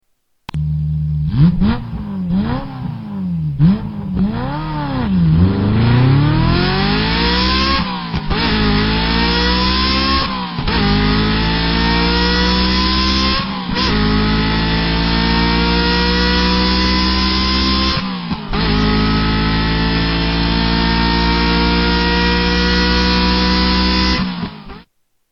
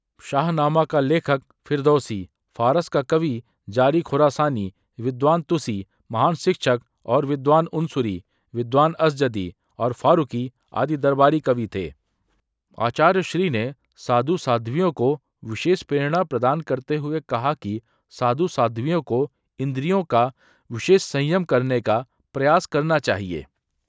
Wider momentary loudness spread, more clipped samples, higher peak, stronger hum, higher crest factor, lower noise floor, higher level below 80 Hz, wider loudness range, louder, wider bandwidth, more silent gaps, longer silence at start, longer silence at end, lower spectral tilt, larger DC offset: second, 7 LU vs 11 LU; neither; about the same, 0 dBFS vs -2 dBFS; neither; second, 14 dB vs 20 dB; second, -54 dBFS vs -70 dBFS; first, -22 dBFS vs -56 dBFS; about the same, 4 LU vs 2 LU; first, -15 LUFS vs -22 LUFS; second, 7 kHz vs 8 kHz; neither; first, 0.55 s vs 0.25 s; about the same, 0.5 s vs 0.45 s; about the same, -6.5 dB/octave vs -6.5 dB/octave; neither